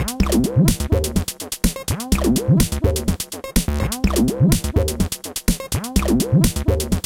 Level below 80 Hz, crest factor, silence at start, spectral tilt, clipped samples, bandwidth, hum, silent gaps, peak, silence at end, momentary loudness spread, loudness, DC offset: -26 dBFS; 16 dB; 0 s; -5.5 dB/octave; under 0.1%; 17 kHz; none; none; -2 dBFS; 0.05 s; 7 LU; -20 LUFS; under 0.1%